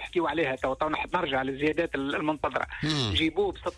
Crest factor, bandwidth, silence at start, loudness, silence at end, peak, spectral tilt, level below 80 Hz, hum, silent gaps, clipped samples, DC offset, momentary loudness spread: 14 dB; 11 kHz; 0 s; -28 LUFS; 0 s; -14 dBFS; -5.5 dB/octave; -48 dBFS; none; none; under 0.1%; under 0.1%; 4 LU